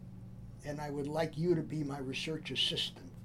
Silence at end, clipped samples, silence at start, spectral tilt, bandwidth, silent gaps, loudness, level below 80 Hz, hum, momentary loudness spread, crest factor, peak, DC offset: 0 s; under 0.1%; 0 s; -5 dB/octave; 15.5 kHz; none; -36 LUFS; -58 dBFS; none; 16 LU; 18 dB; -20 dBFS; under 0.1%